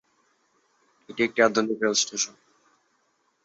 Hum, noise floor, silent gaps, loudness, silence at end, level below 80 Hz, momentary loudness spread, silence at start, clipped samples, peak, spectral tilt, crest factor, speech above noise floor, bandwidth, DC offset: none; -70 dBFS; none; -24 LUFS; 1.15 s; -72 dBFS; 8 LU; 1.1 s; under 0.1%; -6 dBFS; -2 dB/octave; 22 dB; 46 dB; 8.4 kHz; under 0.1%